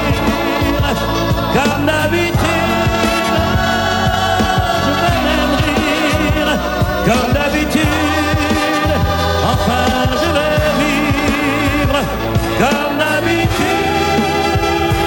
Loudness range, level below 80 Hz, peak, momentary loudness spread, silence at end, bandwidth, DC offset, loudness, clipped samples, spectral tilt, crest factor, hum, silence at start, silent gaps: 1 LU; -26 dBFS; 0 dBFS; 2 LU; 0 s; 17.5 kHz; under 0.1%; -14 LUFS; under 0.1%; -5 dB/octave; 14 dB; none; 0 s; none